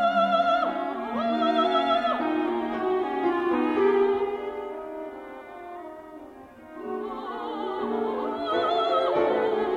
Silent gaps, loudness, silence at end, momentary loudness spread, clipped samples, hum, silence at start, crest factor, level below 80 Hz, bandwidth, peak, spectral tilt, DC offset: none; -26 LUFS; 0 s; 18 LU; under 0.1%; none; 0 s; 14 dB; -62 dBFS; 8.8 kHz; -10 dBFS; -6 dB/octave; under 0.1%